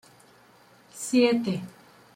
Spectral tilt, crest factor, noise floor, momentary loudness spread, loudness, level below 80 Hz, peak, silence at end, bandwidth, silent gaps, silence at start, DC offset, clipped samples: -5 dB/octave; 18 dB; -56 dBFS; 23 LU; -25 LUFS; -72 dBFS; -10 dBFS; 0.45 s; 16 kHz; none; 0.95 s; under 0.1%; under 0.1%